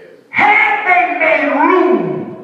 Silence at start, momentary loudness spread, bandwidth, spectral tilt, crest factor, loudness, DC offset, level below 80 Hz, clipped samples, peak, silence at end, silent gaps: 0.35 s; 7 LU; 7.6 kHz; -6.5 dB/octave; 12 dB; -11 LUFS; under 0.1%; -70 dBFS; under 0.1%; 0 dBFS; 0 s; none